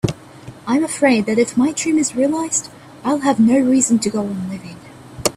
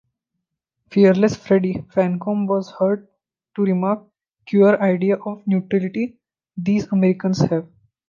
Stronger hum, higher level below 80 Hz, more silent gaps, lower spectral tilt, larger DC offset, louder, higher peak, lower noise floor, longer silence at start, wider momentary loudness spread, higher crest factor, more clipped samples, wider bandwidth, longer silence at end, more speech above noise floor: neither; first, -50 dBFS vs -58 dBFS; neither; second, -4.5 dB/octave vs -8 dB/octave; neither; about the same, -17 LUFS vs -19 LUFS; about the same, -2 dBFS vs -2 dBFS; second, -38 dBFS vs -79 dBFS; second, 0.05 s vs 0.9 s; first, 16 LU vs 11 LU; about the same, 16 dB vs 18 dB; neither; first, 15 kHz vs 7.2 kHz; second, 0 s vs 0.45 s; second, 22 dB vs 61 dB